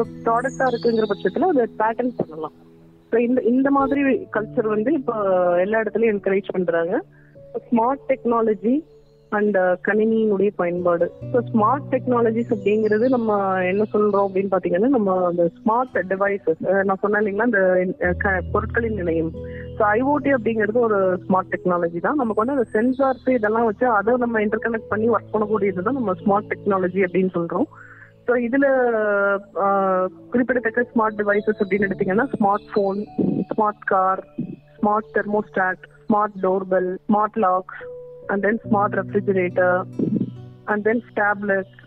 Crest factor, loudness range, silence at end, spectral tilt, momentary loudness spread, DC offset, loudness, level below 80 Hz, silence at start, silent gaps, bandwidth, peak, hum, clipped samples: 14 dB; 2 LU; 0.25 s; -8.5 dB/octave; 5 LU; under 0.1%; -21 LUFS; -52 dBFS; 0 s; none; 8.6 kHz; -6 dBFS; none; under 0.1%